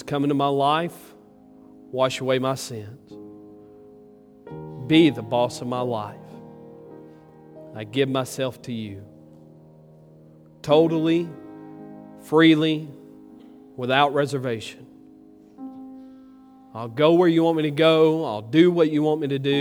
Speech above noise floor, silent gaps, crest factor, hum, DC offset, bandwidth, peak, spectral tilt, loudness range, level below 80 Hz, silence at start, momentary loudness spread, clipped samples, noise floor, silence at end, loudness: 29 dB; none; 20 dB; none; under 0.1%; 15.5 kHz; -2 dBFS; -6 dB/octave; 10 LU; -66 dBFS; 0 s; 25 LU; under 0.1%; -50 dBFS; 0 s; -21 LUFS